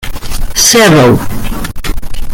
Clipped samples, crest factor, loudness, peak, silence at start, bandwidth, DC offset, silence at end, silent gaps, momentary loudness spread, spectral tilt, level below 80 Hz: 0.3%; 8 dB; -7 LUFS; 0 dBFS; 0 s; 18.5 kHz; under 0.1%; 0 s; none; 17 LU; -3.5 dB/octave; -18 dBFS